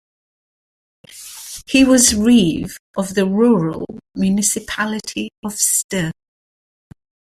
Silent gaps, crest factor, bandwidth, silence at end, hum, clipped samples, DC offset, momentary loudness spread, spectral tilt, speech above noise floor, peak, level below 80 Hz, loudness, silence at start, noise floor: 2.79-2.94 s, 5.38-5.43 s, 5.84-5.89 s; 18 dB; 16 kHz; 1.2 s; none; under 0.1%; under 0.1%; 18 LU; -3.5 dB/octave; over 74 dB; 0 dBFS; -46 dBFS; -16 LUFS; 1.15 s; under -90 dBFS